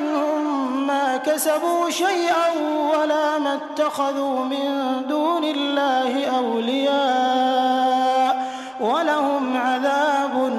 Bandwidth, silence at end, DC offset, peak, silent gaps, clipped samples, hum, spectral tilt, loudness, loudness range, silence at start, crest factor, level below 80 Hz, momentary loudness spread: 14.5 kHz; 0 s; under 0.1%; -8 dBFS; none; under 0.1%; none; -2.5 dB/octave; -21 LUFS; 2 LU; 0 s; 12 dB; -78 dBFS; 4 LU